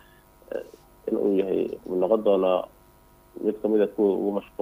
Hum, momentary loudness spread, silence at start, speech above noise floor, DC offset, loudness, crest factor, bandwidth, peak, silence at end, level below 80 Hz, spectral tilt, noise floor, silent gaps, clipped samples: none; 15 LU; 0.5 s; 31 dB; under 0.1%; -25 LUFS; 18 dB; 15.5 kHz; -8 dBFS; 0.15 s; -60 dBFS; -8 dB/octave; -55 dBFS; none; under 0.1%